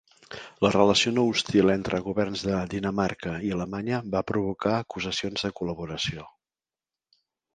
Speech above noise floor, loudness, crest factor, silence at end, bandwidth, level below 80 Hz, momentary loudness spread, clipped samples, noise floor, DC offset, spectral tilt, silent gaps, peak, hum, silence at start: over 64 dB; -26 LUFS; 22 dB; 1.25 s; 9.6 kHz; -52 dBFS; 10 LU; under 0.1%; under -90 dBFS; under 0.1%; -5 dB/octave; none; -6 dBFS; none; 0.3 s